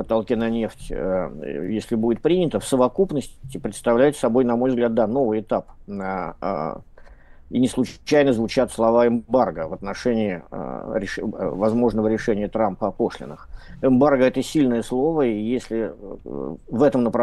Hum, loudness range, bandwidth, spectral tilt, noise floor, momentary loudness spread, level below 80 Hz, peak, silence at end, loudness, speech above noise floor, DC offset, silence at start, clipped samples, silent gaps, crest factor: none; 3 LU; 12.5 kHz; -6.5 dB/octave; -44 dBFS; 13 LU; -44 dBFS; -4 dBFS; 0 s; -22 LUFS; 23 dB; under 0.1%; 0 s; under 0.1%; none; 16 dB